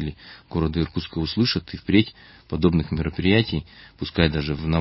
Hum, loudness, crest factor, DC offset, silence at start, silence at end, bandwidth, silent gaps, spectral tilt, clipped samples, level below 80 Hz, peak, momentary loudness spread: none; -23 LUFS; 22 dB; under 0.1%; 0 s; 0 s; 5.8 kHz; none; -10 dB/octave; under 0.1%; -36 dBFS; -2 dBFS; 11 LU